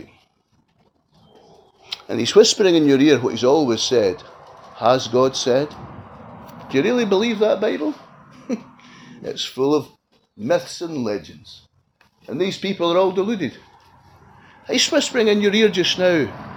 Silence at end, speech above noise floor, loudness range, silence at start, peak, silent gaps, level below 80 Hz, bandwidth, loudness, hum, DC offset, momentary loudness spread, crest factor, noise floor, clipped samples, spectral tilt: 0 s; 45 dB; 8 LU; 1.9 s; 0 dBFS; none; -60 dBFS; 19.5 kHz; -19 LUFS; none; under 0.1%; 19 LU; 20 dB; -63 dBFS; under 0.1%; -4 dB/octave